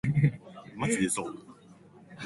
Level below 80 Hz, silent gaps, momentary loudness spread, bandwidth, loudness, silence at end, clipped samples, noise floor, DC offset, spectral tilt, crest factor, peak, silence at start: -58 dBFS; none; 19 LU; 11.5 kHz; -30 LUFS; 0 s; under 0.1%; -54 dBFS; under 0.1%; -5.5 dB/octave; 20 dB; -12 dBFS; 0.05 s